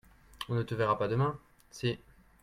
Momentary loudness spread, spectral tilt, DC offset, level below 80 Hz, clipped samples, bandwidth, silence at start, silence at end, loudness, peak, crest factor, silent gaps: 16 LU; -6.5 dB/octave; under 0.1%; -60 dBFS; under 0.1%; 14 kHz; 0.35 s; 0.45 s; -33 LUFS; -14 dBFS; 20 dB; none